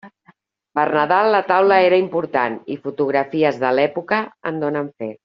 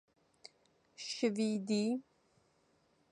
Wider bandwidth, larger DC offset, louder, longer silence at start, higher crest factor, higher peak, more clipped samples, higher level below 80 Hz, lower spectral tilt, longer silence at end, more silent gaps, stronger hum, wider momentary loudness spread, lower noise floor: second, 6.2 kHz vs 10.5 kHz; neither; first, -18 LUFS vs -36 LUFS; second, 0.05 s vs 0.45 s; about the same, 16 dB vs 18 dB; first, -2 dBFS vs -20 dBFS; neither; first, -66 dBFS vs -86 dBFS; second, -3.5 dB/octave vs -5 dB/octave; second, 0.1 s vs 1.1 s; neither; neither; first, 12 LU vs 9 LU; second, -56 dBFS vs -74 dBFS